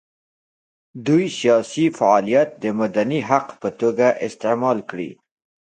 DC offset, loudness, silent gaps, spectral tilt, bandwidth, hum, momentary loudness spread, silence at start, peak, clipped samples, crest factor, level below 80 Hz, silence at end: under 0.1%; -19 LUFS; none; -6 dB/octave; 9.4 kHz; none; 11 LU; 0.95 s; 0 dBFS; under 0.1%; 20 dB; -66 dBFS; 0.65 s